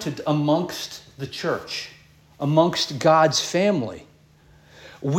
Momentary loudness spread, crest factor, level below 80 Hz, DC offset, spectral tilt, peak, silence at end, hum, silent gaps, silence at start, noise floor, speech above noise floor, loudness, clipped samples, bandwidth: 16 LU; 20 dB; -60 dBFS; under 0.1%; -5 dB/octave; -4 dBFS; 0 s; none; none; 0 s; -54 dBFS; 32 dB; -22 LUFS; under 0.1%; 17 kHz